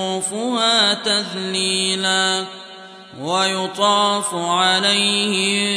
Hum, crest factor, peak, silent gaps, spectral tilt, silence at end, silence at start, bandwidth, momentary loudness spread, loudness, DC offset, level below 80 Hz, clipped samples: none; 16 dB; -4 dBFS; none; -2 dB/octave; 0 s; 0 s; 11 kHz; 9 LU; -17 LUFS; under 0.1%; -74 dBFS; under 0.1%